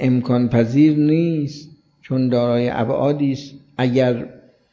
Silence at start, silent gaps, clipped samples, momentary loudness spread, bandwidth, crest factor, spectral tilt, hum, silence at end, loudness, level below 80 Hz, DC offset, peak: 0 s; none; under 0.1%; 14 LU; 7.2 kHz; 14 dB; -8.5 dB/octave; none; 0.4 s; -18 LUFS; -54 dBFS; under 0.1%; -4 dBFS